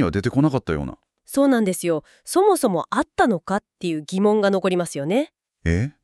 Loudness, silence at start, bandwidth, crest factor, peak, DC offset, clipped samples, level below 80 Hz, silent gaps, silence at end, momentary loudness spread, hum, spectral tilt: -21 LUFS; 0 s; 13.5 kHz; 16 dB; -4 dBFS; under 0.1%; under 0.1%; -42 dBFS; none; 0.15 s; 9 LU; none; -6 dB/octave